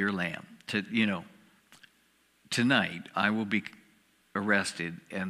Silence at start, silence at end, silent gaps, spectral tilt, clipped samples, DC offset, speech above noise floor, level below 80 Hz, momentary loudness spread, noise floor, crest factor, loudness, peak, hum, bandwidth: 0 s; 0 s; none; -4.5 dB/octave; under 0.1%; under 0.1%; 38 dB; -74 dBFS; 12 LU; -68 dBFS; 22 dB; -30 LUFS; -10 dBFS; none; 14 kHz